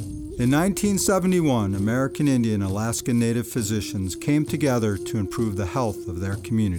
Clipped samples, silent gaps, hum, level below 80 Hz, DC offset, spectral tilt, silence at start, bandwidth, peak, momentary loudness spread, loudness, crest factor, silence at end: under 0.1%; none; none; -46 dBFS; under 0.1%; -6 dB/octave; 0 s; over 20 kHz; -10 dBFS; 7 LU; -23 LUFS; 14 dB; 0 s